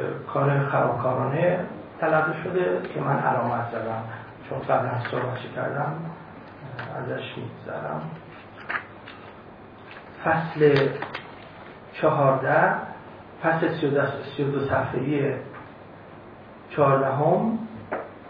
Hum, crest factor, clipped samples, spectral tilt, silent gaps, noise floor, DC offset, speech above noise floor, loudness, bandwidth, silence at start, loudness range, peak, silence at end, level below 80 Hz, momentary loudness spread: none; 20 dB; under 0.1%; -9.5 dB/octave; none; -44 dBFS; under 0.1%; 21 dB; -25 LUFS; 5.2 kHz; 0 s; 10 LU; -6 dBFS; 0 s; -62 dBFS; 22 LU